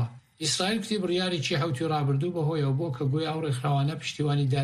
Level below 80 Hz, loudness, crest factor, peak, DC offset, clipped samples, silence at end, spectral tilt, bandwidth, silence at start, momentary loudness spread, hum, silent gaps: -62 dBFS; -28 LUFS; 14 dB; -14 dBFS; under 0.1%; under 0.1%; 0 s; -5.5 dB/octave; 12.5 kHz; 0 s; 3 LU; none; none